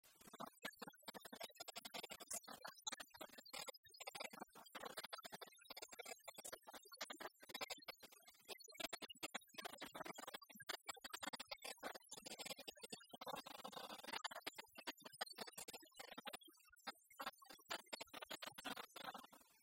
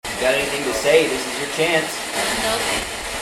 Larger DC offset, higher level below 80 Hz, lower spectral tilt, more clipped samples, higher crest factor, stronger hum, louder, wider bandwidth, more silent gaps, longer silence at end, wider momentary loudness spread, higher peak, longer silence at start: neither; second, -88 dBFS vs -44 dBFS; about the same, -1 dB/octave vs -2 dB/octave; neither; first, 26 dB vs 18 dB; neither; second, -53 LUFS vs -19 LUFS; about the same, 16 kHz vs 16.5 kHz; first, 3.78-3.83 s vs none; about the same, 0 s vs 0 s; about the same, 7 LU vs 7 LU; second, -28 dBFS vs -2 dBFS; about the same, 0.05 s vs 0.05 s